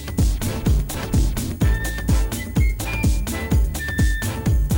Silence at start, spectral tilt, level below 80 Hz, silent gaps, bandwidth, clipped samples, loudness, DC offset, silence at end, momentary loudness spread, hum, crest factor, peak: 0 s; -5.5 dB/octave; -22 dBFS; none; 19 kHz; under 0.1%; -22 LUFS; under 0.1%; 0 s; 2 LU; none; 12 dB; -8 dBFS